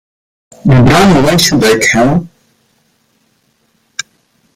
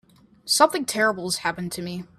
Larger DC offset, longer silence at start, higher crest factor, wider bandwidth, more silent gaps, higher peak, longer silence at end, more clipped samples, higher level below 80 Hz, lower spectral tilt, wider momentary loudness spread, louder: neither; first, 0.65 s vs 0.45 s; second, 12 dB vs 22 dB; about the same, 16.5 kHz vs 15.5 kHz; neither; about the same, 0 dBFS vs -2 dBFS; first, 2.3 s vs 0.15 s; neither; first, -32 dBFS vs -64 dBFS; first, -5 dB/octave vs -2.5 dB/octave; first, 18 LU vs 13 LU; first, -8 LUFS vs -22 LUFS